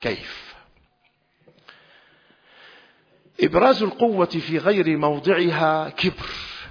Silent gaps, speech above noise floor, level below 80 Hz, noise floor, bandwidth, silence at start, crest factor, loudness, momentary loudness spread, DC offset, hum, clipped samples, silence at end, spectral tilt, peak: none; 45 dB; -52 dBFS; -65 dBFS; 5.4 kHz; 0 s; 20 dB; -21 LUFS; 14 LU; under 0.1%; none; under 0.1%; 0 s; -7 dB/octave; -4 dBFS